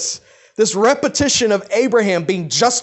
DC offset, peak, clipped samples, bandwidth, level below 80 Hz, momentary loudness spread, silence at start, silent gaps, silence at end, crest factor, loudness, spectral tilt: under 0.1%; -2 dBFS; under 0.1%; 8.6 kHz; -50 dBFS; 7 LU; 0 s; none; 0 s; 14 dB; -16 LUFS; -3 dB/octave